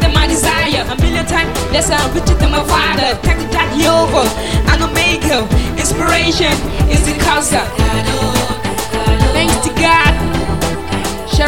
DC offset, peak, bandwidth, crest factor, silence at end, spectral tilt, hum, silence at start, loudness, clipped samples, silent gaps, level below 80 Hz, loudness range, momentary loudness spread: 3%; 0 dBFS; 17 kHz; 14 dB; 0 s; -4 dB/octave; none; 0 s; -13 LUFS; under 0.1%; none; -20 dBFS; 1 LU; 5 LU